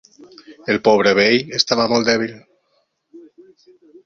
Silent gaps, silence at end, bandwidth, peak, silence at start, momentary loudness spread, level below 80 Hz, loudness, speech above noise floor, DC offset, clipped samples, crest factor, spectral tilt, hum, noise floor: none; 0.85 s; 7.6 kHz; 0 dBFS; 0.5 s; 9 LU; -58 dBFS; -16 LUFS; 50 dB; under 0.1%; under 0.1%; 18 dB; -3.5 dB/octave; none; -66 dBFS